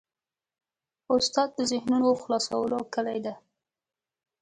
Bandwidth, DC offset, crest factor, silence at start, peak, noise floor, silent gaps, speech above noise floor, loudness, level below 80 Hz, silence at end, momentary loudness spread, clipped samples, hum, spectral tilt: 9.6 kHz; under 0.1%; 18 dB; 1.1 s; -10 dBFS; under -90 dBFS; none; over 64 dB; -27 LUFS; -68 dBFS; 1.05 s; 7 LU; under 0.1%; none; -3.5 dB/octave